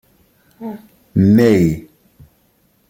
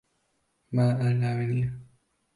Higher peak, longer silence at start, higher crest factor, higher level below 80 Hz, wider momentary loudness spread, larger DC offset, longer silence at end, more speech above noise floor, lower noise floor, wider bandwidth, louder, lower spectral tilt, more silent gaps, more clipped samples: first, -2 dBFS vs -12 dBFS; about the same, 0.6 s vs 0.7 s; about the same, 16 dB vs 16 dB; first, -46 dBFS vs -60 dBFS; first, 21 LU vs 9 LU; neither; first, 1.1 s vs 0.55 s; about the same, 45 dB vs 48 dB; second, -58 dBFS vs -73 dBFS; first, 16.5 kHz vs 11 kHz; first, -13 LUFS vs -27 LUFS; about the same, -8 dB/octave vs -9 dB/octave; neither; neither